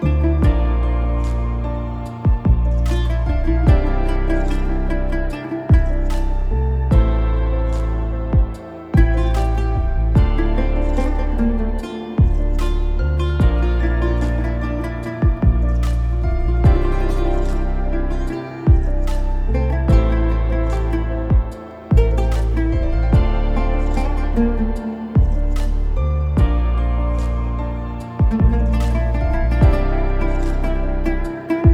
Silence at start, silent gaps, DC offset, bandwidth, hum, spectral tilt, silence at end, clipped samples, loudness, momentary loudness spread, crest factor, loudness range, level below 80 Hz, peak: 0 s; none; under 0.1%; 7.6 kHz; none; -8.5 dB/octave; 0 s; under 0.1%; -20 LUFS; 7 LU; 16 dB; 1 LU; -18 dBFS; 0 dBFS